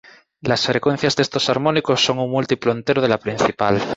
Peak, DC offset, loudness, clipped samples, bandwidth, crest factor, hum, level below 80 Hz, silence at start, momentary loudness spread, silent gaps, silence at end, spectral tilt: -2 dBFS; under 0.1%; -19 LUFS; under 0.1%; 8 kHz; 16 dB; none; -54 dBFS; 0.45 s; 3 LU; none; 0 s; -4.5 dB/octave